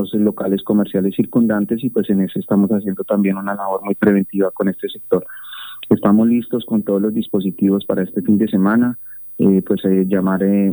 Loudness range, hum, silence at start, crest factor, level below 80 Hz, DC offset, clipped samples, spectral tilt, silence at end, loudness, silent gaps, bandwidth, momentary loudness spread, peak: 2 LU; none; 0 s; 16 dB; -58 dBFS; under 0.1%; under 0.1%; -10.5 dB/octave; 0 s; -17 LUFS; none; over 20 kHz; 6 LU; 0 dBFS